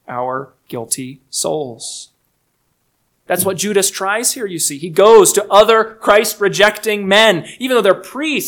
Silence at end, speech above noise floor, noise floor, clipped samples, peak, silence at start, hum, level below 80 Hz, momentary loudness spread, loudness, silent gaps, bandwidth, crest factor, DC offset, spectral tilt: 0 s; 51 dB; -65 dBFS; 0.4%; 0 dBFS; 0.1 s; none; -54 dBFS; 14 LU; -13 LUFS; none; 19.5 kHz; 14 dB; under 0.1%; -2.5 dB/octave